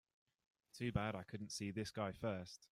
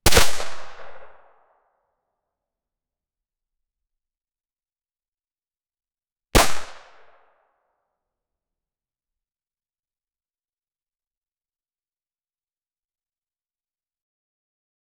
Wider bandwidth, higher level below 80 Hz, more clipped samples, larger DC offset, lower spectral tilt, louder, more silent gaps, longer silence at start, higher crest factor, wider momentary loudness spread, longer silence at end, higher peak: about the same, 15.5 kHz vs 15.5 kHz; second, -68 dBFS vs -38 dBFS; neither; neither; first, -5.5 dB/octave vs -2.5 dB/octave; second, -45 LUFS vs -21 LUFS; neither; first, 0.75 s vs 0.05 s; about the same, 22 dB vs 22 dB; second, 7 LU vs 25 LU; second, 0.05 s vs 8.2 s; second, -24 dBFS vs -4 dBFS